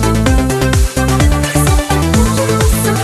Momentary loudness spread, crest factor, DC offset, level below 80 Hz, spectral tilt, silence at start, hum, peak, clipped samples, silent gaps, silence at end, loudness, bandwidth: 1 LU; 10 dB; under 0.1%; -16 dBFS; -5 dB/octave; 0 s; none; 0 dBFS; under 0.1%; none; 0 s; -12 LUFS; 13.5 kHz